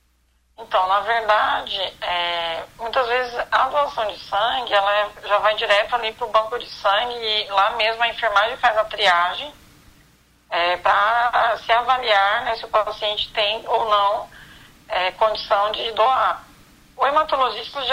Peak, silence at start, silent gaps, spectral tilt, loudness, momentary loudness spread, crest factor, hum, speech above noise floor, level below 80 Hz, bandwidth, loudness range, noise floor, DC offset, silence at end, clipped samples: -6 dBFS; 0.6 s; none; -2 dB/octave; -20 LUFS; 7 LU; 16 dB; none; 42 dB; -52 dBFS; 16 kHz; 2 LU; -62 dBFS; under 0.1%; 0 s; under 0.1%